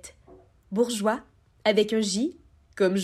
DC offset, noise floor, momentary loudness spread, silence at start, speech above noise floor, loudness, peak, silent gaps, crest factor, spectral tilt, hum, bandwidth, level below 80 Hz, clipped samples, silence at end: under 0.1%; -54 dBFS; 10 LU; 0.05 s; 30 dB; -26 LUFS; -10 dBFS; none; 18 dB; -4.5 dB/octave; none; 14.5 kHz; -62 dBFS; under 0.1%; 0 s